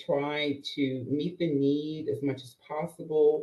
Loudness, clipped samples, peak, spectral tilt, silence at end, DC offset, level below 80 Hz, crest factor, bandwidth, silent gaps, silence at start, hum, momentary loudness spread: -30 LUFS; under 0.1%; -14 dBFS; -7 dB/octave; 0 s; under 0.1%; -72 dBFS; 14 dB; 12.5 kHz; none; 0 s; none; 10 LU